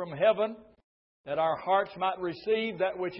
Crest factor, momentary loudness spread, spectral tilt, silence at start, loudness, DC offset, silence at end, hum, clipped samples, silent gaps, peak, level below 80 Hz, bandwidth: 16 dB; 8 LU; -9 dB/octave; 0 s; -29 LUFS; under 0.1%; 0 s; none; under 0.1%; 0.84-1.24 s; -14 dBFS; -70 dBFS; 5.8 kHz